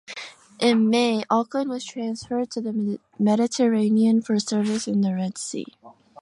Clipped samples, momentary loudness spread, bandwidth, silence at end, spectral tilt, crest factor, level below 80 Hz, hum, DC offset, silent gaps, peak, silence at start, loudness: under 0.1%; 12 LU; 11.5 kHz; 0.3 s; -5 dB/octave; 16 dB; -68 dBFS; none; under 0.1%; none; -6 dBFS; 0.1 s; -23 LUFS